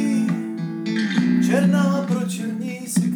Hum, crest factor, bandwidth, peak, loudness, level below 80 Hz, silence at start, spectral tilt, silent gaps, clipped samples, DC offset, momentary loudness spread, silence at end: none; 14 dB; 18 kHz; -6 dBFS; -21 LUFS; -80 dBFS; 0 s; -6 dB/octave; none; under 0.1%; under 0.1%; 10 LU; 0 s